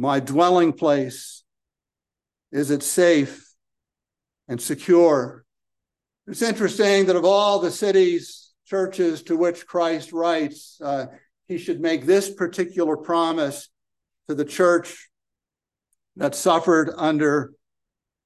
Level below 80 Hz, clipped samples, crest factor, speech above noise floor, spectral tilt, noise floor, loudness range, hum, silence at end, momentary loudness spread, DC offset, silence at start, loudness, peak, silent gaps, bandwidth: -72 dBFS; under 0.1%; 18 dB; 69 dB; -4.5 dB/octave; -89 dBFS; 4 LU; none; 0.8 s; 14 LU; under 0.1%; 0 s; -21 LUFS; -4 dBFS; none; 12.5 kHz